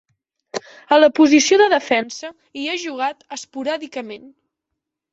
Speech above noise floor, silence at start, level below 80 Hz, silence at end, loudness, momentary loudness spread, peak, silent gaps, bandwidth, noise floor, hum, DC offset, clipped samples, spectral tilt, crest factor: 63 dB; 0.55 s; -66 dBFS; 0.85 s; -17 LUFS; 20 LU; -2 dBFS; none; 8 kHz; -81 dBFS; none; under 0.1%; under 0.1%; -2 dB/octave; 18 dB